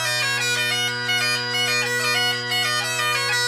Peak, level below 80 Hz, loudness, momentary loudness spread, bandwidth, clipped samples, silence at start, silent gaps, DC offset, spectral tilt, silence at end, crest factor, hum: -10 dBFS; -66 dBFS; -20 LUFS; 1 LU; 15.5 kHz; under 0.1%; 0 s; none; under 0.1%; -1 dB/octave; 0 s; 12 dB; none